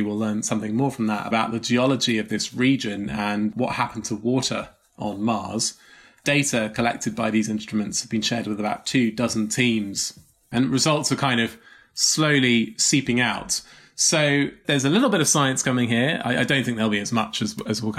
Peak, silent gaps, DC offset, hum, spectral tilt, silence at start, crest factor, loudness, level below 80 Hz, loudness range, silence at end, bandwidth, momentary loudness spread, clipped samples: -6 dBFS; none; under 0.1%; none; -3.5 dB/octave; 0 s; 16 dB; -22 LUFS; -56 dBFS; 4 LU; 0 s; 15.5 kHz; 8 LU; under 0.1%